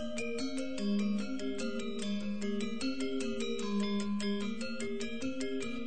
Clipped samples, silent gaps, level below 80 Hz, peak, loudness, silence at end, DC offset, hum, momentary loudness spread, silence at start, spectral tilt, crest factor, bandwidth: under 0.1%; none; -62 dBFS; -24 dBFS; -36 LUFS; 0 s; 1%; none; 4 LU; 0 s; -5 dB/octave; 12 dB; 9.2 kHz